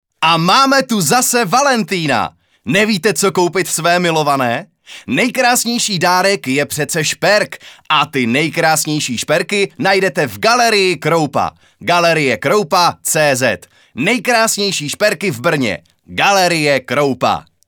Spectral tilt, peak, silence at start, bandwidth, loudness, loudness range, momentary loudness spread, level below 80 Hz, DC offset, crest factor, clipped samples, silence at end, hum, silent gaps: -3 dB/octave; 0 dBFS; 0.2 s; over 20 kHz; -14 LUFS; 2 LU; 6 LU; -58 dBFS; under 0.1%; 14 dB; under 0.1%; 0.25 s; none; none